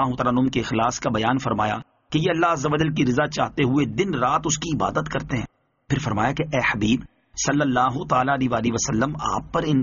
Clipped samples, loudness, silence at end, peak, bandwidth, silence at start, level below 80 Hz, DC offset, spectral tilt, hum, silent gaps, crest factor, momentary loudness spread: under 0.1%; -22 LUFS; 0 s; -6 dBFS; 7.4 kHz; 0 s; -46 dBFS; under 0.1%; -5 dB/octave; none; none; 16 dB; 6 LU